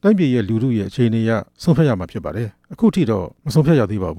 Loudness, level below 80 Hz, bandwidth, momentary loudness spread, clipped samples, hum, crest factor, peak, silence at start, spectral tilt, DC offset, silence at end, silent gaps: -18 LUFS; -44 dBFS; 14.5 kHz; 10 LU; under 0.1%; none; 12 dB; -4 dBFS; 0.05 s; -8 dB/octave; under 0.1%; 0 s; none